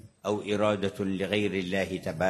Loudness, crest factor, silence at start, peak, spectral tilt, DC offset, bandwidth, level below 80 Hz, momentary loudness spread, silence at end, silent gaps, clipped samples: -29 LUFS; 20 dB; 0.05 s; -10 dBFS; -5.5 dB/octave; under 0.1%; 13.5 kHz; -56 dBFS; 5 LU; 0 s; none; under 0.1%